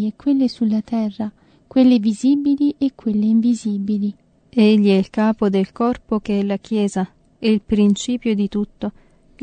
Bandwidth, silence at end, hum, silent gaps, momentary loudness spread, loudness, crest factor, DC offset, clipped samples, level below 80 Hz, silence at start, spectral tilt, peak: 9.2 kHz; 0.5 s; none; none; 10 LU; -18 LUFS; 14 dB; under 0.1%; under 0.1%; -50 dBFS; 0 s; -7 dB/octave; -4 dBFS